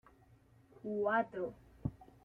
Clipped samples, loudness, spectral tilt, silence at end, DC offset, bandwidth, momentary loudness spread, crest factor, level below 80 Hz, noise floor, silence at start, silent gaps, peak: under 0.1%; -39 LUFS; -8.5 dB/octave; 0.2 s; under 0.1%; 6 kHz; 11 LU; 18 dB; -64 dBFS; -65 dBFS; 0.85 s; none; -22 dBFS